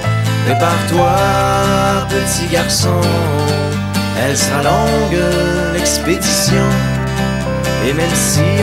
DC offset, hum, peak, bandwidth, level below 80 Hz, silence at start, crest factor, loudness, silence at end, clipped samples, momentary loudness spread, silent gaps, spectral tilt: under 0.1%; none; 0 dBFS; 16 kHz; -30 dBFS; 0 s; 14 dB; -14 LUFS; 0 s; under 0.1%; 5 LU; none; -4.5 dB/octave